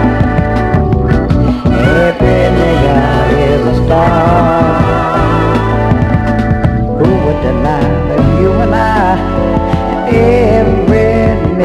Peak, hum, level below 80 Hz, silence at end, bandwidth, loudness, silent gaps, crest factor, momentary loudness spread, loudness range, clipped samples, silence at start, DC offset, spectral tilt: 0 dBFS; none; -18 dBFS; 0 s; 11.5 kHz; -10 LUFS; none; 10 dB; 3 LU; 2 LU; 0.4%; 0 s; under 0.1%; -8.5 dB/octave